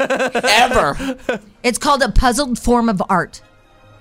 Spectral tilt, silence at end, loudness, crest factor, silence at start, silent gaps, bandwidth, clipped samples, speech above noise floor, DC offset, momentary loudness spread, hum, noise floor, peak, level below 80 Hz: -3.5 dB/octave; 0.65 s; -16 LUFS; 14 dB; 0 s; none; 16 kHz; under 0.1%; 31 dB; under 0.1%; 11 LU; none; -47 dBFS; -4 dBFS; -26 dBFS